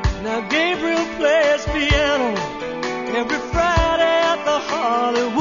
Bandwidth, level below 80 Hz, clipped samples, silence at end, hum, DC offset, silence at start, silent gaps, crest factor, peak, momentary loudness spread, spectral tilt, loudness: 7.4 kHz; -32 dBFS; under 0.1%; 0 s; none; 0.2%; 0 s; none; 14 dB; -4 dBFS; 8 LU; -4.5 dB/octave; -19 LUFS